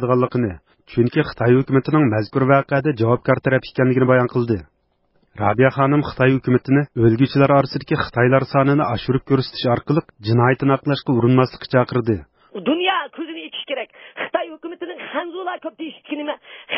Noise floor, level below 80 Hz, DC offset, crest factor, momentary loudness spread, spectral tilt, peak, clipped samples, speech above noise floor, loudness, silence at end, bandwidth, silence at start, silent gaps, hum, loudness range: -63 dBFS; -48 dBFS; under 0.1%; 16 dB; 13 LU; -12 dB/octave; -2 dBFS; under 0.1%; 45 dB; -19 LUFS; 0 s; 5.8 kHz; 0 s; none; none; 8 LU